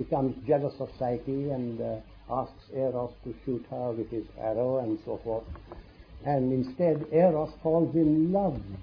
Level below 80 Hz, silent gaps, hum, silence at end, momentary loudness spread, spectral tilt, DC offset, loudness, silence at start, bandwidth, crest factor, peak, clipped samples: -52 dBFS; none; none; 0 s; 13 LU; -11.5 dB/octave; under 0.1%; -29 LUFS; 0 s; 5.2 kHz; 18 dB; -10 dBFS; under 0.1%